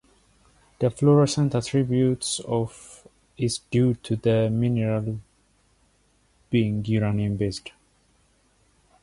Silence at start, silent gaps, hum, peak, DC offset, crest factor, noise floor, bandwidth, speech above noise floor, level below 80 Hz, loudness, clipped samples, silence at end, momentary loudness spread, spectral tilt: 0.8 s; none; none; -8 dBFS; under 0.1%; 18 dB; -64 dBFS; 11.5 kHz; 41 dB; -52 dBFS; -24 LUFS; under 0.1%; 1.35 s; 11 LU; -6.5 dB/octave